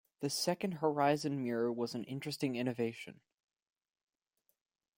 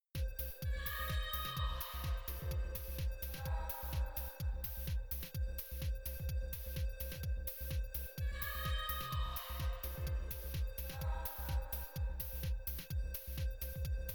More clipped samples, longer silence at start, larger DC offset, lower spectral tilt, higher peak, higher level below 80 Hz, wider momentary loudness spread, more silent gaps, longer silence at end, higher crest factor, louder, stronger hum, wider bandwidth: neither; about the same, 0.2 s vs 0.15 s; neither; about the same, -5 dB/octave vs -4.5 dB/octave; first, -18 dBFS vs -24 dBFS; second, -80 dBFS vs -42 dBFS; first, 9 LU vs 4 LU; neither; first, 1.85 s vs 0 s; about the same, 20 dB vs 16 dB; first, -36 LUFS vs -42 LUFS; neither; second, 16.5 kHz vs over 20 kHz